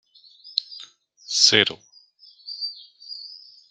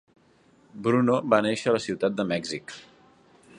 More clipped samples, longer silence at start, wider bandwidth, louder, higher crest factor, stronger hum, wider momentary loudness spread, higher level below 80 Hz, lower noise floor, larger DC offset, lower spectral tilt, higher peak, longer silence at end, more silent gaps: neither; second, 0.45 s vs 0.75 s; first, 12 kHz vs 10.5 kHz; first, -20 LUFS vs -25 LUFS; about the same, 26 dB vs 22 dB; neither; first, 26 LU vs 14 LU; second, -74 dBFS vs -66 dBFS; second, -53 dBFS vs -60 dBFS; neither; second, -0.5 dB/octave vs -5.5 dB/octave; first, -2 dBFS vs -6 dBFS; second, 0.35 s vs 0.75 s; neither